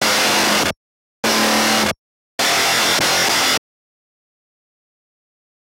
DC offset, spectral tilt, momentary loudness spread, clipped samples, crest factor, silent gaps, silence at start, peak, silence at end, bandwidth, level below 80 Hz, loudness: under 0.1%; -1 dB/octave; 8 LU; under 0.1%; 14 dB; 0.77-1.23 s, 1.98-2.38 s; 0 s; -6 dBFS; 2.2 s; 16 kHz; -54 dBFS; -15 LUFS